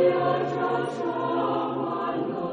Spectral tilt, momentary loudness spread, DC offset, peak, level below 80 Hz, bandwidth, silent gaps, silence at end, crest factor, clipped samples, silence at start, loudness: -7.5 dB/octave; 4 LU; under 0.1%; -10 dBFS; -68 dBFS; 9.4 kHz; none; 0 s; 16 dB; under 0.1%; 0 s; -26 LUFS